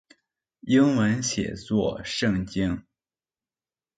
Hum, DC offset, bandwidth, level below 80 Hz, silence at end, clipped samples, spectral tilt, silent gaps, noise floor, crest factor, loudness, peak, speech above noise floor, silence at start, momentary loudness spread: none; under 0.1%; 9.4 kHz; -50 dBFS; 1.2 s; under 0.1%; -5 dB/octave; none; under -90 dBFS; 18 dB; -25 LUFS; -10 dBFS; over 66 dB; 0.65 s; 9 LU